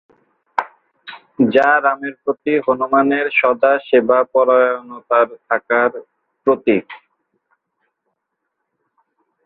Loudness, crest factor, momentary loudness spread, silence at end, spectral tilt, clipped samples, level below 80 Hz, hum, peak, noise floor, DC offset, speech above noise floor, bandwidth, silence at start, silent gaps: -16 LUFS; 18 dB; 12 LU; 2.5 s; -7.5 dB/octave; under 0.1%; -64 dBFS; none; 0 dBFS; -75 dBFS; under 0.1%; 60 dB; 5.4 kHz; 0.55 s; none